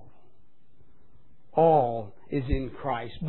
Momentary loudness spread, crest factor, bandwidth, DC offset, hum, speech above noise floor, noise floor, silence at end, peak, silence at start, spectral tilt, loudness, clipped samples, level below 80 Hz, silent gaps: 12 LU; 18 dB; 4.2 kHz; 0.8%; none; 40 dB; -66 dBFS; 0 s; -10 dBFS; 1.55 s; -11 dB/octave; -27 LUFS; under 0.1%; -42 dBFS; none